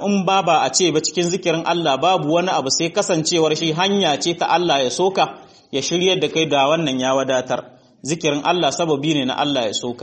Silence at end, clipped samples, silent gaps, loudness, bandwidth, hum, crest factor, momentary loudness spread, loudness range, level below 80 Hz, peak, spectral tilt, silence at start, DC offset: 0 s; under 0.1%; none; -18 LUFS; 8.8 kHz; none; 16 dB; 5 LU; 2 LU; -62 dBFS; -4 dBFS; -3.5 dB/octave; 0 s; under 0.1%